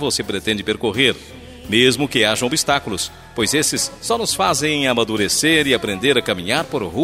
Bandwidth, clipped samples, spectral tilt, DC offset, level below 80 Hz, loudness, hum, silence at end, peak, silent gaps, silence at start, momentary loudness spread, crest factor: 16 kHz; under 0.1%; -3 dB/octave; under 0.1%; -46 dBFS; -17 LUFS; none; 0 s; -2 dBFS; none; 0 s; 8 LU; 18 dB